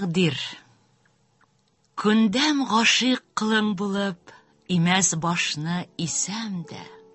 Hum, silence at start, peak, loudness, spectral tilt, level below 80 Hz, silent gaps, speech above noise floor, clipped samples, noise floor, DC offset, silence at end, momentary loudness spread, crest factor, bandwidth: none; 0 s; -4 dBFS; -23 LUFS; -3.5 dB/octave; -64 dBFS; none; 43 dB; under 0.1%; -66 dBFS; under 0.1%; 0.15 s; 14 LU; 20 dB; 8.6 kHz